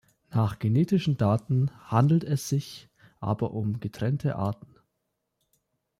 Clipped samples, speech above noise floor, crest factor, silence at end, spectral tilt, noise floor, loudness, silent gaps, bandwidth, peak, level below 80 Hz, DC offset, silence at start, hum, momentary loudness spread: under 0.1%; 54 dB; 18 dB; 1.45 s; -7.5 dB/octave; -80 dBFS; -27 LUFS; none; 15 kHz; -10 dBFS; -60 dBFS; under 0.1%; 0.3 s; none; 9 LU